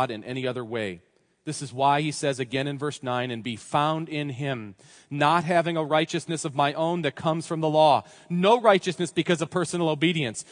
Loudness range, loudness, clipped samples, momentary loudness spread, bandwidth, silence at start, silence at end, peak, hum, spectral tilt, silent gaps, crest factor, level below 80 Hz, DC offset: 5 LU; -25 LUFS; under 0.1%; 11 LU; 10.5 kHz; 0 s; 0.1 s; -4 dBFS; none; -5 dB/octave; none; 20 dB; -72 dBFS; under 0.1%